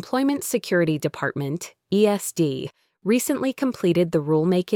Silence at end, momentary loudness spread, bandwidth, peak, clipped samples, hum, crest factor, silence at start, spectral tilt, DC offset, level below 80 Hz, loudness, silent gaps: 0 s; 9 LU; 19.5 kHz; -6 dBFS; under 0.1%; none; 16 dB; 0 s; -5.5 dB/octave; under 0.1%; -62 dBFS; -23 LUFS; none